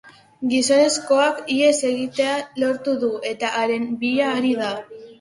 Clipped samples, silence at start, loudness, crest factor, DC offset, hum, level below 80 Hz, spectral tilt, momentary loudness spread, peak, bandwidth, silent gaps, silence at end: under 0.1%; 0.05 s; -20 LUFS; 16 dB; under 0.1%; none; -66 dBFS; -2.5 dB/octave; 7 LU; -4 dBFS; 11.5 kHz; none; 0.05 s